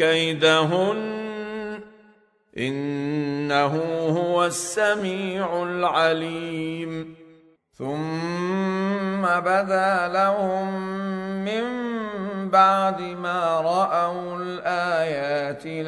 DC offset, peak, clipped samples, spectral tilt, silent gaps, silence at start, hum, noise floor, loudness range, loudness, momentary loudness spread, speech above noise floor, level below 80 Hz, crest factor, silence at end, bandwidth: under 0.1%; -4 dBFS; under 0.1%; -5 dB/octave; none; 0 s; none; -57 dBFS; 4 LU; -23 LUFS; 11 LU; 35 dB; -66 dBFS; 18 dB; 0 s; 11 kHz